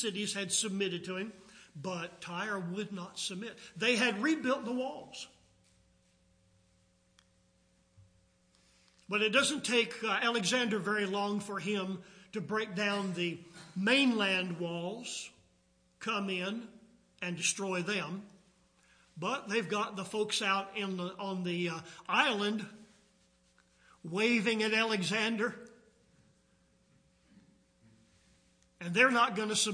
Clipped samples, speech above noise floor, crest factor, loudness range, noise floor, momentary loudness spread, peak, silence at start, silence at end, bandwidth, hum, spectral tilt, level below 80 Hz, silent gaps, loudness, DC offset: under 0.1%; 37 dB; 24 dB; 6 LU; -70 dBFS; 15 LU; -12 dBFS; 0 s; 0 s; 10.5 kHz; none; -3 dB/octave; -78 dBFS; none; -33 LUFS; under 0.1%